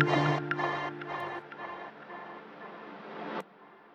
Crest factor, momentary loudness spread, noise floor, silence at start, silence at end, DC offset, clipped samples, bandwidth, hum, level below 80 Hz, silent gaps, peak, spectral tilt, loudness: 24 dB; 17 LU; -55 dBFS; 0 s; 0 s; under 0.1%; under 0.1%; 8.4 kHz; none; -72 dBFS; none; -10 dBFS; -6.5 dB/octave; -35 LUFS